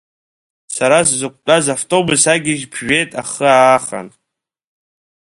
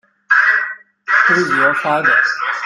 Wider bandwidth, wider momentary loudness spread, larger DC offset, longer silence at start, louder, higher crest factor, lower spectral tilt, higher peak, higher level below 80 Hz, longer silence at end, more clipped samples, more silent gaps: about the same, 11.5 kHz vs 12 kHz; first, 11 LU vs 6 LU; neither; first, 0.7 s vs 0.3 s; about the same, -13 LUFS vs -13 LUFS; about the same, 16 dB vs 16 dB; about the same, -3 dB/octave vs -4 dB/octave; about the same, 0 dBFS vs 0 dBFS; first, -54 dBFS vs -64 dBFS; first, 1.3 s vs 0 s; neither; neither